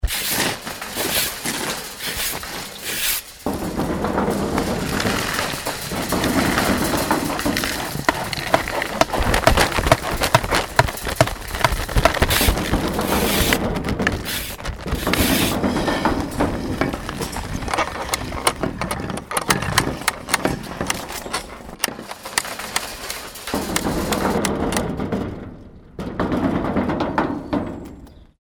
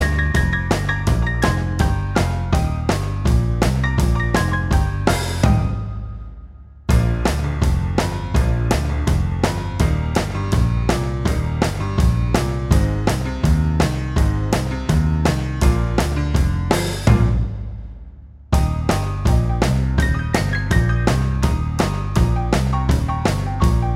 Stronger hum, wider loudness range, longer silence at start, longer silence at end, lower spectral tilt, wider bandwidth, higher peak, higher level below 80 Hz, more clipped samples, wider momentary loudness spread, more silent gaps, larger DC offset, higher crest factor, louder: neither; first, 5 LU vs 2 LU; about the same, 0 s vs 0 s; first, 0.25 s vs 0 s; second, -3.5 dB/octave vs -6 dB/octave; first, over 20 kHz vs 15 kHz; about the same, 0 dBFS vs 0 dBFS; second, -32 dBFS vs -22 dBFS; neither; first, 10 LU vs 4 LU; neither; neither; about the same, 22 dB vs 18 dB; about the same, -21 LUFS vs -19 LUFS